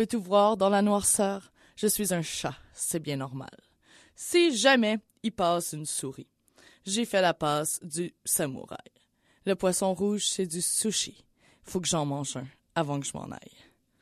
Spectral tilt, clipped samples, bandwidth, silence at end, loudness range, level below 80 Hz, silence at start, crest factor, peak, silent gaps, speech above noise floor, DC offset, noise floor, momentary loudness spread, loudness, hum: -3.5 dB/octave; under 0.1%; 14 kHz; 0.65 s; 3 LU; -64 dBFS; 0 s; 22 dB; -8 dBFS; none; 39 dB; under 0.1%; -67 dBFS; 16 LU; -27 LUFS; none